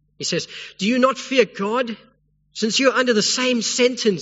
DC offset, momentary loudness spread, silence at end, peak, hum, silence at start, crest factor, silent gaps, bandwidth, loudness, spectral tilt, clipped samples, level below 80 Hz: under 0.1%; 10 LU; 0 s; -2 dBFS; none; 0.2 s; 18 dB; none; 8 kHz; -19 LUFS; -3 dB/octave; under 0.1%; -66 dBFS